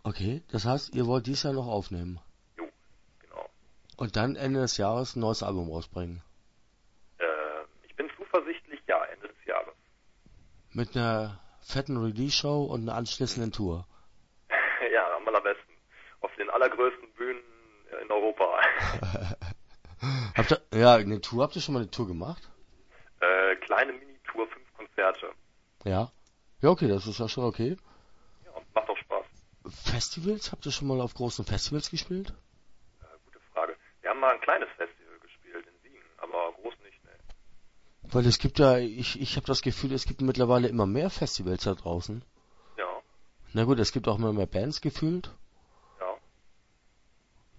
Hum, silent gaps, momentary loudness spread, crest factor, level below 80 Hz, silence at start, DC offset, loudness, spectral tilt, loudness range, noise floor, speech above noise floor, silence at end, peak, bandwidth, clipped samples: none; none; 18 LU; 24 dB; -48 dBFS; 0.05 s; under 0.1%; -29 LUFS; -5.5 dB/octave; 8 LU; -65 dBFS; 37 dB; 1.4 s; -6 dBFS; 8 kHz; under 0.1%